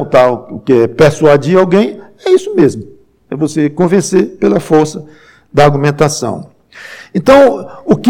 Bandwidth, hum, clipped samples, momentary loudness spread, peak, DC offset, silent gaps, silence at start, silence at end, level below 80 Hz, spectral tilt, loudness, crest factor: 16 kHz; none; under 0.1%; 13 LU; 0 dBFS; under 0.1%; none; 0 s; 0 s; -42 dBFS; -6 dB/octave; -11 LUFS; 10 dB